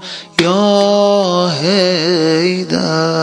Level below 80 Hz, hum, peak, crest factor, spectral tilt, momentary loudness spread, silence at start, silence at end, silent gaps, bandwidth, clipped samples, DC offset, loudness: -56 dBFS; none; 0 dBFS; 12 dB; -5 dB/octave; 4 LU; 0 s; 0 s; none; 11 kHz; under 0.1%; under 0.1%; -13 LUFS